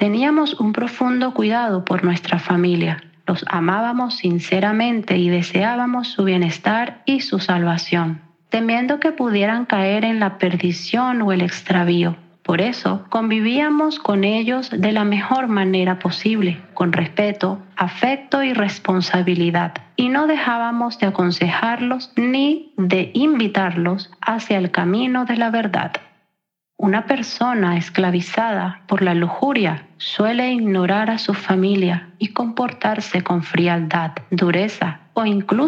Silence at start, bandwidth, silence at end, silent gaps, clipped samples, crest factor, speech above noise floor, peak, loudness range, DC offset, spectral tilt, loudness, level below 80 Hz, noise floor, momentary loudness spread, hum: 0 s; 7.4 kHz; 0 s; none; under 0.1%; 18 dB; 58 dB; -2 dBFS; 2 LU; under 0.1%; -6.5 dB/octave; -19 LUFS; -74 dBFS; -76 dBFS; 5 LU; none